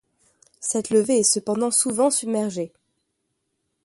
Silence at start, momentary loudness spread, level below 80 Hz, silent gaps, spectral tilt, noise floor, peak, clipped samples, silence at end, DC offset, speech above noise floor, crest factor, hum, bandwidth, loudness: 0.6 s; 11 LU; -68 dBFS; none; -3.5 dB/octave; -76 dBFS; -6 dBFS; under 0.1%; 1.2 s; under 0.1%; 54 dB; 18 dB; none; 12 kHz; -21 LUFS